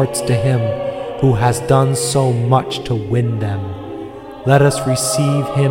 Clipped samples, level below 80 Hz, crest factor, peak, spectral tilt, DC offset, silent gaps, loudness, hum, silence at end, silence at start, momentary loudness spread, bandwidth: under 0.1%; -42 dBFS; 16 dB; 0 dBFS; -5.5 dB/octave; 0.1%; none; -16 LUFS; none; 0 s; 0 s; 11 LU; 17 kHz